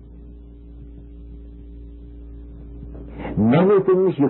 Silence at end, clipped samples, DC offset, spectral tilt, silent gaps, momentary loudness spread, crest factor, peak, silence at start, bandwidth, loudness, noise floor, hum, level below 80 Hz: 0 s; under 0.1%; under 0.1%; -13 dB/octave; none; 27 LU; 16 dB; -6 dBFS; 0.1 s; 4.2 kHz; -17 LUFS; -40 dBFS; 60 Hz at -55 dBFS; -40 dBFS